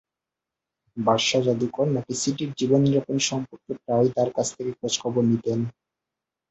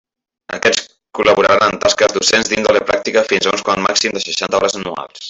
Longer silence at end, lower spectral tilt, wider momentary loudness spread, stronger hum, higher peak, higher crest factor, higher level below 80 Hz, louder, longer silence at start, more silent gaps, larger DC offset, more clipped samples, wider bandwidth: first, 0.8 s vs 0 s; first, -5 dB/octave vs -2 dB/octave; first, 10 LU vs 7 LU; neither; second, -6 dBFS vs 0 dBFS; about the same, 18 dB vs 14 dB; second, -62 dBFS vs -50 dBFS; second, -24 LUFS vs -14 LUFS; first, 0.95 s vs 0.5 s; neither; neither; neither; about the same, 8.4 kHz vs 8.4 kHz